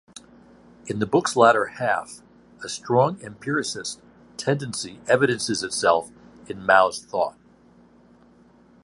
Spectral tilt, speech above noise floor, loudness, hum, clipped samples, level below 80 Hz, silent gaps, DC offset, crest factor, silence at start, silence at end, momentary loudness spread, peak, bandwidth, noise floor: -4 dB/octave; 32 dB; -23 LUFS; none; under 0.1%; -62 dBFS; none; under 0.1%; 22 dB; 0.85 s; 1.55 s; 21 LU; -2 dBFS; 11.5 kHz; -54 dBFS